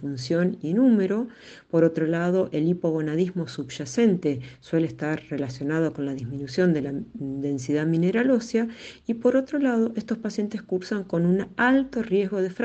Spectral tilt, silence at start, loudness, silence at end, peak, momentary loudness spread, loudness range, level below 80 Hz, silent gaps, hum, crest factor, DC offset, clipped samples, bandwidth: -7 dB/octave; 0 s; -25 LUFS; 0 s; -8 dBFS; 10 LU; 3 LU; -60 dBFS; none; none; 16 dB; under 0.1%; under 0.1%; 8.4 kHz